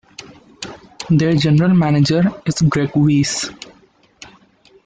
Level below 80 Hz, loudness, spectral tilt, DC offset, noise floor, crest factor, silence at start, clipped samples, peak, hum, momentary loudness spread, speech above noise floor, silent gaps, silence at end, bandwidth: -48 dBFS; -15 LUFS; -6 dB/octave; under 0.1%; -52 dBFS; 12 dB; 0.2 s; under 0.1%; -4 dBFS; none; 19 LU; 38 dB; none; 1.35 s; 9.4 kHz